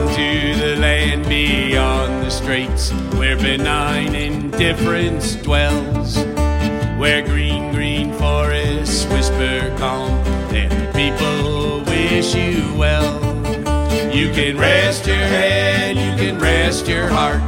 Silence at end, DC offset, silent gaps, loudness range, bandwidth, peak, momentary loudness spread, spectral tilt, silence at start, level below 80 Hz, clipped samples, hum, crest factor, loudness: 0 s; under 0.1%; none; 3 LU; 16.5 kHz; 0 dBFS; 5 LU; -5 dB/octave; 0 s; -22 dBFS; under 0.1%; none; 16 dB; -17 LUFS